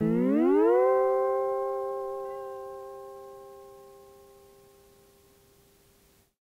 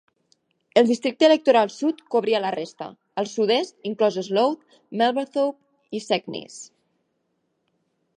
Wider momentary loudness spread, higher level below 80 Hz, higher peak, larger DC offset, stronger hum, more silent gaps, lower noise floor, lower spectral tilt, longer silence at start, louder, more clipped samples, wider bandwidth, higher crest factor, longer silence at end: first, 24 LU vs 17 LU; first, -70 dBFS vs -78 dBFS; second, -12 dBFS vs -2 dBFS; neither; neither; neither; second, -63 dBFS vs -73 dBFS; first, -8.5 dB/octave vs -4.5 dB/octave; second, 0 s vs 0.75 s; second, -26 LUFS vs -22 LUFS; neither; first, 16 kHz vs 10.5 kHz; second, 16 dB vs 22 dB; first, 2.55 s vs 1.5 s